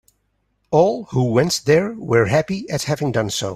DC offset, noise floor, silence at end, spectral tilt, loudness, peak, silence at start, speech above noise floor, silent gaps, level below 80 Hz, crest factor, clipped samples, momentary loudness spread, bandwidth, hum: under 0.1%; -68 dBFS; 0 s; -5 dB/octave; -19 LUFS; -2 dBFS; 0.7 s; 50 dB; none; -52 dBFS; 16 dB; under 0.1%; 5 LU; 15.5 kHz; none